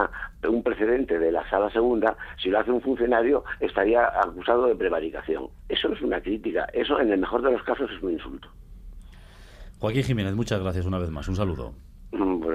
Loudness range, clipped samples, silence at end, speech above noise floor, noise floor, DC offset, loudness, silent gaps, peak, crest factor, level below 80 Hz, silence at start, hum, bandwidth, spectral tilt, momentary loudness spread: 6 LU; under 0.1%; 0 s; 22 dB; -46 dBFS; under 0.1%; -25 LUFS; none; -6 dBFS; 18 dB; -44 dBFS; 0 s; none; 13 kHz; -7 dB/octave; 9 LU